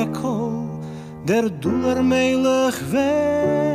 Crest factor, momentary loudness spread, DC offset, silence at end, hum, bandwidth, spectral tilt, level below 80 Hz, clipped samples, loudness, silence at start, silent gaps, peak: 12 dB; 11 LU; under 0.1%; 0 s; none; 15.5 kHz; -6 dB/octave; -50 dBFS; under 0.1%; -20 LUFS; 0 s; none; -8 dBFS